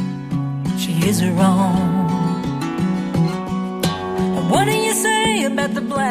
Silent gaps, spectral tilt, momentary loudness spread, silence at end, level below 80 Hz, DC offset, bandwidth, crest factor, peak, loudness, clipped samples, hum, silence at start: none; -5 dB/octave; 7 LU; 0 s; -44 dBFS; under 0.1%; 15.5 kHz; 16 dB; -2 dBFS; -19 LUFS; under 0.1%; none; 0 s